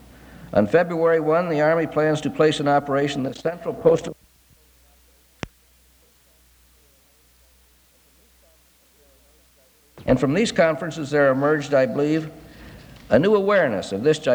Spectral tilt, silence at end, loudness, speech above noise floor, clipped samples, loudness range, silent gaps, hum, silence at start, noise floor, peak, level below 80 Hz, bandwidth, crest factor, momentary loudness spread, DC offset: -6 dB/octave; 0 s; -20 LUFS; 38 dB; under 0.1%; 8 LU; none; none; 0.3 s; -57 dBFS; -2 dBFS; -52 dBFS; over 20 kHz; 20 dB; 10 LU; under 0.1%